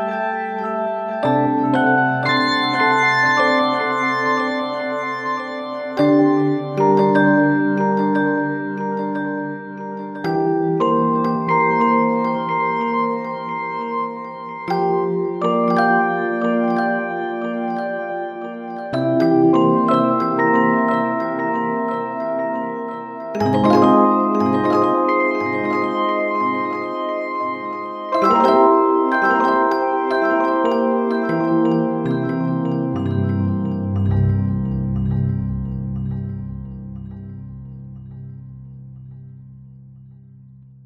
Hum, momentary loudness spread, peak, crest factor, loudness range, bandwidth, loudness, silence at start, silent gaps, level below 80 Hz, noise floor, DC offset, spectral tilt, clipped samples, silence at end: none; 14 LU; -2 dBFS; 18 dB; 6 LU; 9.4 kHz; -18 LUFS; 0 s; none; -44 dBFS; -43 dBFS; under 0.1%; -7.5 dB/octave; under 0.1%; 0.4 s